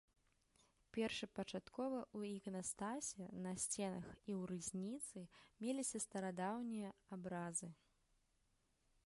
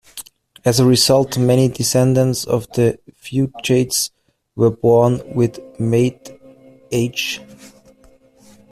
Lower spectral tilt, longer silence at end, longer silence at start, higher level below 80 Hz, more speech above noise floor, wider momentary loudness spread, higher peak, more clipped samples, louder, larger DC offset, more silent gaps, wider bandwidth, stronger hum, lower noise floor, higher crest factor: about the same, -4 dB/octave vs -5 dB/octave; first, 1.3 s vs 1.05 s; first, 0.95 s vs 0.15 s; second, -78 dBFS vs -50 dBFS; about the same, 35 dB vs 34 dB; second, 8 LU vs 11 LU; second, -30 dBFS vs -2 dBFS; neither; second, -47 LUFS vs -17 LUFS; neither; neither; second, 11.5 kHz vs 15 kHz; neither; first, -82 dBFS vs -50 dBFS; about the same, 18 dB vs 16 dB